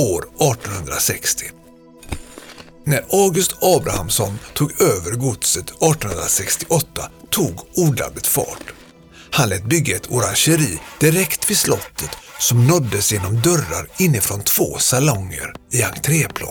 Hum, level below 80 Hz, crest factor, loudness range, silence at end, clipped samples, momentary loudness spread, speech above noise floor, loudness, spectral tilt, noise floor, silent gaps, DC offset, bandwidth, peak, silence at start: none; -42 dBFS; 16 dB; 3 LU; 0 s; under 0.1%; 12 LU; 25 dB; -17 LUFS; -4 dB/octave; -44 dBFS; none; under 0.1%; over 20 kHz; -4 dBFS; 0 s